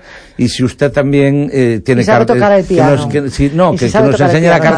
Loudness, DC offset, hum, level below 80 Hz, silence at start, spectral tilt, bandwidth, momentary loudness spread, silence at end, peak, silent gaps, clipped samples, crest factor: -11 LUFS; under 0.1%; none; -34 dBFS; 0.1 s; -6.5 dB/octave; 10.5 kHz; 5 LU; 0 s; 0 dBFS; none; under 0.1%; 10 dB